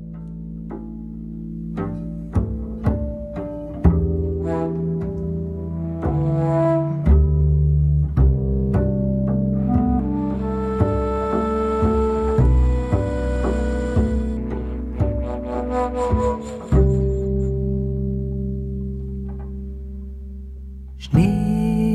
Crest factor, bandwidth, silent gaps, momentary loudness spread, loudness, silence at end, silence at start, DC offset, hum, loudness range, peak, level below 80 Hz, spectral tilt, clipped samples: 18 dB; 8.6 kHz; none; 14 LU; -21 LUFS; 0 s; 0 s; under 0.1%; none; 7 LU; -2 dBFS; -24 dBFS; -9.5 dB/octave; under 0.1%